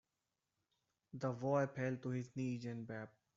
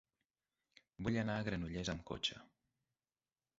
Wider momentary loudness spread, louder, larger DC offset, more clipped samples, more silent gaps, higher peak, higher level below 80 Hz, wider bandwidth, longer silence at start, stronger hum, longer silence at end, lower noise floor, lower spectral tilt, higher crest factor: first, 12 LU vs 6 LU; about the same, -42 LUFS vs -41 LUFS; neither; neither; neither; about the same, -24 dBFS vs -24 dBFS; second, -82 dBFS vs -62 dBFS; about the same, 7.6 kHz vs 7.6 kHz; first, 1.15 s vs 1 s; neither; second, 0.3 s vs 1.15 s; about the same, -90 dBFS vs under -90 dBFS; first, -7.5 dB/octave vs -4 dB/octave; about the same, 20 dB vs 20 dB